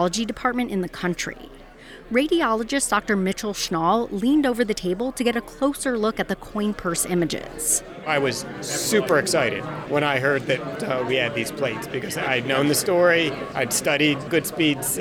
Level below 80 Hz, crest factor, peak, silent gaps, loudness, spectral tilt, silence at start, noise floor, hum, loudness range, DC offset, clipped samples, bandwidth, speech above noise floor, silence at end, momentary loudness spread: -50 dBFS; 16 dB; -6 dBFS; none; -22 LUFS; -3.5 dB/octave; 0 s; -43 dBFS; none; 3 LU; under 0.1%; under 0.1%; 19.5 kHz; 21 dB; 0 s; 7 LU